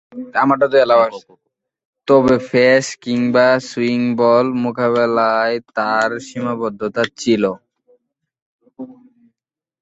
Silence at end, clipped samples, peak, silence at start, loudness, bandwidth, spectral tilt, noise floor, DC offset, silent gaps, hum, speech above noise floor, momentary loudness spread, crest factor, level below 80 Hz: 0.9 s; under 0.1%; -2 dBFS; 0.1 s; -16 LUFS; 8.2 kHz; -5.5 dB/octave; -84 dBFS; under 0.1%; 1.85-1.93 s, 8.42-8.59 s; none; 69 dB; 11 LU; 16 dB; -58 dBFS